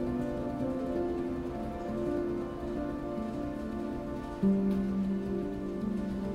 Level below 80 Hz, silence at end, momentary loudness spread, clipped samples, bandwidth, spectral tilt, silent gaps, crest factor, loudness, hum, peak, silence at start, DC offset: -48 dBFS; 0 s; 7 LU; under 0.1%; 11.5 kHz; -8.5 dB/octave; none; 14 dB; -34 LUFS; none; -18 dBFS; 0 s; under 0.1%